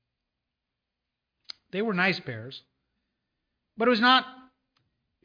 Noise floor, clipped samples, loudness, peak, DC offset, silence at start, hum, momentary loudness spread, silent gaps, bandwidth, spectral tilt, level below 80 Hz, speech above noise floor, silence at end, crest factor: -85 dBFS; under 0.1%; -24 LUFS; -8 dBFS; under 0.1%; 1.75 s; none; 24 LU; none; 5.4 kHz; -5.5 dB/octave; -76 dBFS; 60 dB; 0.85 s; 22 dB